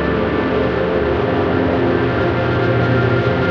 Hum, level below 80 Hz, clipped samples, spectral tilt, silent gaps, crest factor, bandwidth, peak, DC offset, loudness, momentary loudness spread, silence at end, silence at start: none; -32 dBFS; under 0.1%; -8.5 dB/octave; none; 12 dB; 6.4 kHz; -4 dBFS; under 0.1%; -16 LUFS; 2 LU; 0 s; 0 s